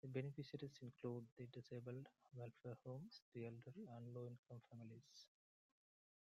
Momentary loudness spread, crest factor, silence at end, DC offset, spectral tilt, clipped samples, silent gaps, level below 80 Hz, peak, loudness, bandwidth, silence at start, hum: 9 LU; 22 dB; 1.05 s; under 0.1%; -7.5 dB/octave; under 0.1%; 1.32-1.37 s, 3.22-3.32 s, 4.38-4.43 s; -90 dBFS; -34 dBFS; -56 LUFS; 7.8 kHz; 0.05 s; none